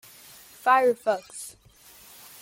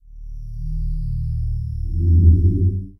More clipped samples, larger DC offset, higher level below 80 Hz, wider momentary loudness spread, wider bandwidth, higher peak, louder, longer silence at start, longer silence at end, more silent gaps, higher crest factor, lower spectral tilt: neither; neither; second, -70 dBFS vs -22 dBFS; first, 26 LU vs 20 LU; first, 17 kHz vs 0.5 kHz; second, -6 dBFS vs -2 dBFS; second, -24 LUFS vs -19 LUFS; first, 0.65 s vs 0.1 s; first, 0.95 s vs 0.1 s; neither; about the same, 20 dB vs 16 dB; second, -2.5 dB/octave vs -12.5 dB/octave